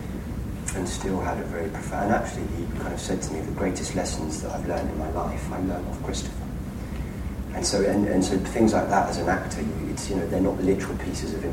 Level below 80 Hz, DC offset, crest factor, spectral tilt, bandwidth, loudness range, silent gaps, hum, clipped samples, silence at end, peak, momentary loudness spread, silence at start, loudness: -36 dBFS; under 0.1%; 20 dB; -5.5 dB/octave; 16.5 kHz; 5 LU; none; none; under 0.1%; 0 s; -6 dBFS; 11 LU; 0 s; -27 LUFS